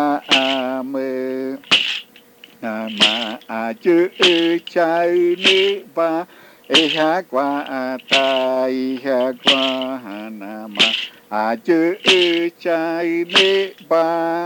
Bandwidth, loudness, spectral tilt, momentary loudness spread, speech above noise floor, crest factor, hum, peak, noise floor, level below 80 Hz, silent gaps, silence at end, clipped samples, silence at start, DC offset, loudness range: 19 kHz; -17 LUFS; -3 dB/octave; 12 LU; 28 dB; 18 dB; none; 0 dBFS; -46 dBFS; -78 dBFS; none; 0 s; under 0.1%; 0 s; under 0.1%; 3 LU